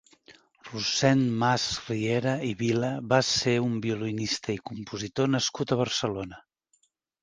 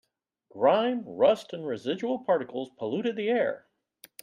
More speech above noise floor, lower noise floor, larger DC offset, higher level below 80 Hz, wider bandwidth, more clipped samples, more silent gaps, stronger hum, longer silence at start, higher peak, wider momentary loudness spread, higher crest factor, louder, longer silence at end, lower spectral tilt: first, 44 dB vs 38 dB; first, -71 dBFS vs -65 dBFS; neither; first, -60 dBFS vs -76 dBFS; second, 10 kHz vs 15.5 kHz; neither; neither; neither; second, 0.3 s vs 0.55 s; first, -6 dBFS vs -10 dBFS; about the same, 11 LU vs 10 LU; about the same, 22 dB vs 18 dB; about the same, -27 LUFS vs -28 LUFS; first, 0.8 s vs 0.65 s; second, -4.5 dB/octave vs -6 dB/octave